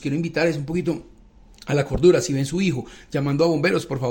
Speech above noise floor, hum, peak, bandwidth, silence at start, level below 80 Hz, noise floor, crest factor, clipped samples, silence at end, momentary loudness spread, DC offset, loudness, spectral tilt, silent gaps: 28 dB; none; -4 dBFS; 17 kHz; 0 s; -44 dBFS; -49 dBFS; 18 dB; under 0.1%; 0 s; 12 LU; under 0.1%; -22 LUFS; -6 dB/octave; none